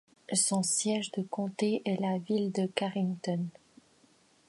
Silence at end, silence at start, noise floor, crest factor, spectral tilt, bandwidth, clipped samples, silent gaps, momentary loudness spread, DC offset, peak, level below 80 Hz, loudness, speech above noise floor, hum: 1 s; 0.3 s; -65 dBFS; 20 dB; -4 dB/octave; 11.5 kHz; under 0.1%; none; 8 LU; under 0.1%; -12 dBFS; -80 dBFS; -31 LUFS; 34 dB; none